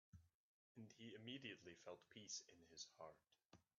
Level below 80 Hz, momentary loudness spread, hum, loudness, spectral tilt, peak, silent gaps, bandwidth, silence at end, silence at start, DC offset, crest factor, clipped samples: -90 dBFS; 10 LU; none; -58 LUFS; -3 dB/octave; -40 dBFS; 0.35-0.75 s, 3.45-3.50 s; 7.2 kHz; 0.15 s; 0.15 s; under 0.1%; 22 dB; under 0.1%